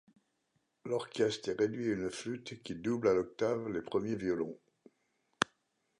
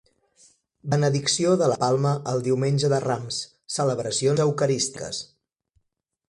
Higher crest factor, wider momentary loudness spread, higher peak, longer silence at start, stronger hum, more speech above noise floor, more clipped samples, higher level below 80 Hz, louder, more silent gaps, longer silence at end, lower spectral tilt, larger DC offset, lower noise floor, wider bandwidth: first, 28 dB vs 18 dB; about the same, 10 LU vs 11 LU; about the same, -8 dBFS vs -8 dBFS; about the same, 0.85 s vs 0.85 s; neither; second, 45 dB vs 54 dB; neither; second, -68 dBFS vs -62 dBFS; second, -35 LUFS vs -24 LUFS; neither; second, 0.55 s vs 1.05 s; about the same, -5 dB/octave vs -5 dB/octave; neither; about the same, -80 dBFS vs -77 dBFS; about the same, 11.5 kHz vs 11.5 kHz